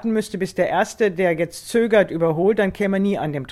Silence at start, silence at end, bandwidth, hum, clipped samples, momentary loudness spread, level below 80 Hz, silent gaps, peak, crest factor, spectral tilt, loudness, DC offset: 0 s; 0 s; 14.5 kHz; none; under 0.1%; 6 LU; -52 dBFS; none; -4 dBFS; 16 dB; -6 dB/octave; -20 LUFS; under 0.1%